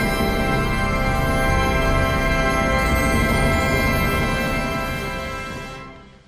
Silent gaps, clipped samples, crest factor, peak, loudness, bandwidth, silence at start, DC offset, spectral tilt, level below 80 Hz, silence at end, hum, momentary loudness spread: none; under 0.1%; 12 dB; -8 dBFS; -20 LUFS; 16 kHz; 0 s; under 0.1%; -5 dB/octave; -26 dBFS; 0.2 s; none; 10 LU